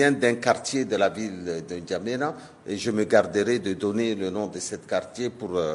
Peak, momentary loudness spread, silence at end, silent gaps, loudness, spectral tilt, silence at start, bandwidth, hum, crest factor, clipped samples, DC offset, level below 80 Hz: -4 dBFS; 11 LU; 0 s; none; -26 LUFS; -4.5 dB/octave; 0 s; 11.5 kHz; none; 20 dB; under 0.1%; under 0.1%; -64 dBFS